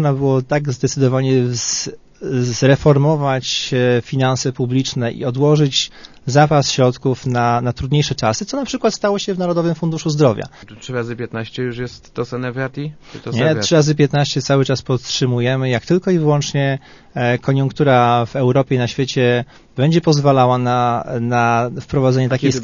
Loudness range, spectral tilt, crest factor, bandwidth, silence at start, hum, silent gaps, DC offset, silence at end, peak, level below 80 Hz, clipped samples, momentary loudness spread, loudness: 4 LU; -5.5 dB/octave; 16 dB; 7.4 kHz; 0 s; none; none; under 0.1%; 0 s; 0 dBFS; -46 dBFS; under 0.1%; 11 LU; -17 LUFS